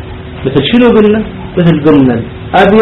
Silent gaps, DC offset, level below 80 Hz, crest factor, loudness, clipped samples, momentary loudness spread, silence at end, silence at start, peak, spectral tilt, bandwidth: none; under 0.1%; -30 dBFS; 8 dB; -9 LUFS; 1%; 11 LU; 0 s; 0 s; 0 dBFS; -8.5 dB/octave; 6.4 kHz